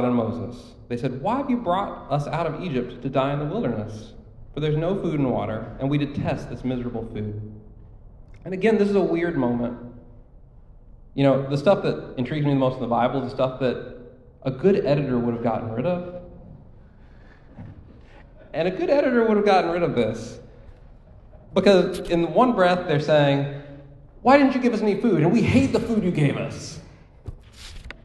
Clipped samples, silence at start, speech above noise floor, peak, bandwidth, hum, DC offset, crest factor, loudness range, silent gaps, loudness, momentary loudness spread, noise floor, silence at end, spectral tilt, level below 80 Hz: under 0.1%; 0 s; 25 dB; -2 dBFS; 12 kHz; none; under 0.1%; 22 dB; 7 LU; none; -23 LUFS; 20 LU; -47 dBFS; 0.1 s; -7.5 dB/octave; -46 dBFS